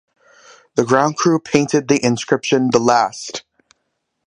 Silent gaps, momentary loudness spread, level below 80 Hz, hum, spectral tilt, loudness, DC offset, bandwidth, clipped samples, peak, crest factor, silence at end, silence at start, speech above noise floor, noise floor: none; 9 LU; -60 dBFS; none; -4.5 dB/octave; -16 LUFS; under 0.1%; 10.5 kHz; under 0.1%; 0 dBFS; 18 dB; 0.85 s; 0.75 s; 56 dB; -72 dBFS